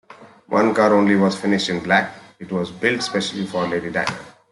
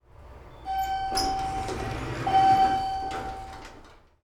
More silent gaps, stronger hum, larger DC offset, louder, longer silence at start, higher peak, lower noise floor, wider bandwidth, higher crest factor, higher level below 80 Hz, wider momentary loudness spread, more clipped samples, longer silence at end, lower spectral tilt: neither; neither; neither; first, -19 LUFS vs -26 LUFS; about the same, 0.1 s vs 0.2 s; first, -2 dBFS vs -12 dBFS; second, -41 dBFS vs -51 dBFS; second, 11.5 kHz vs 16 kHz; about the same, 18 dB vs 16 dB; second, -60 dBFS vs -44 dBFS; second, 11 LU vs 21 LU; neither; about the same, 0.2 s vs 0.3 s; about the same, -5 dB/octave vs -4 dB/octave